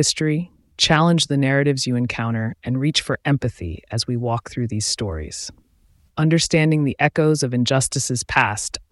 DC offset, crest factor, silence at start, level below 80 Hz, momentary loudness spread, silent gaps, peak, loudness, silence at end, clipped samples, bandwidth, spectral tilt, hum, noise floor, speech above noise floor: under 0.1%; 18 dB; 0 s; -44 dBFS; 10 LU; none; -2 dBFS; -20 LUFS; 0.1 s; under 0.1%; 12 kHz; -4.5 dB/octave; none; -57 dBFS; 37 dB